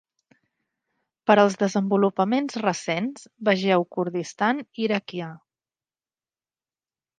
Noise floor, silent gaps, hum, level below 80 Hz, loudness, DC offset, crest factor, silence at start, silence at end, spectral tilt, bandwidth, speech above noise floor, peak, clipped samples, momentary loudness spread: under -90 dBFS; none; none; -76 dBFS; -23 LUFS; under 0.1%; 22 dB; 1.25 s; 1.85 s; -5.5 dB/octave; 9.4 kHz; over 67 dB; -2 dBFS; under 0.1%; 11 LU